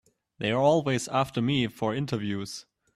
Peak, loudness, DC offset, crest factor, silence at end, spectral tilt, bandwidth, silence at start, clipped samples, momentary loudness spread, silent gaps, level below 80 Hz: -10 dBFS; -27 LUFS; under 0.1%; 16 dB; 0.35 s; -5.5 dB/octave; 14 kHz; 0.4 s; under 0.1%; 11 LU; none; -62 dBFS